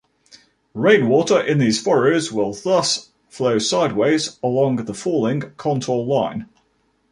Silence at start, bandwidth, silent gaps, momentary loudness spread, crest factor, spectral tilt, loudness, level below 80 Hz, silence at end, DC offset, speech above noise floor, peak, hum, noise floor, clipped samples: 0.75 s; 11.5 kHz; none; 8 LU; 18 dB; -5 dB/octave; -19 LUFS; -60 dBFS; 0.7 s; under 0.1%; 46 dB; -2 dBFS; none; -64 dBFS; under 0.1%